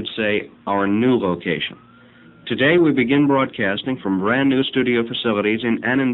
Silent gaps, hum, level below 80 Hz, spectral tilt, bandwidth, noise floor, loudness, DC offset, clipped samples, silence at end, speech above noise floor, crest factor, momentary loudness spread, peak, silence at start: none; none; -56 dBFS; -8.5 dB/octave; 4.1 kHz; -47 dBFS; -19 LUFS; under 0.1%; under 0.1%; 0 s; 28 dB; 16 dB; 8 LU; -4 dBFS; 0 s